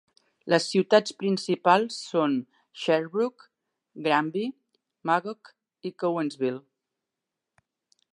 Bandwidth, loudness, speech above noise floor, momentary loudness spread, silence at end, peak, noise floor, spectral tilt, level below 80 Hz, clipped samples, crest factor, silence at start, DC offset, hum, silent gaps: 11.5 kHz; -26 LUFS; 61 dB; 17 LU; 1.55 s; -6 dBFS; -86 dBFS; -5 dB/octave; -82 dBFS; under 0.1%; 22 dB; 0.45 s; under 0.1%; none; none